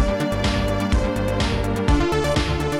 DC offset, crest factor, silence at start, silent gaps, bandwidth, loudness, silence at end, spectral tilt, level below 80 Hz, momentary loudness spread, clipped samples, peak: under 0.1%; 14 dB; 0 s; none; 15.5 kHz; -21 LUFS; 0 s; -6 dB/octave; -26 dBFS; 2 LU; under 0.1%; -6 dBFS